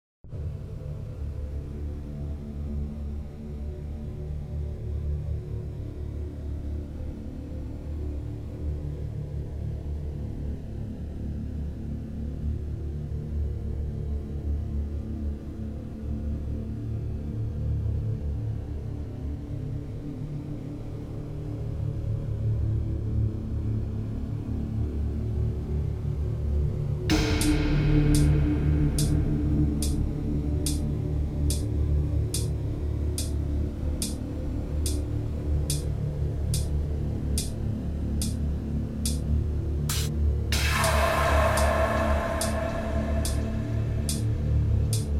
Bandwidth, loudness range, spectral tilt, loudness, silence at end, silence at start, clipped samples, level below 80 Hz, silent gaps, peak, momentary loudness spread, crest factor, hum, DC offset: 15.5 kHz; 10 LU; -6 dB/octave; -29 LUFS; 0 s; 0.25 s; under 0.1%; -32 dBFS; none; -10 dBFS; 12 LU; 18 dB; none; under 0.1%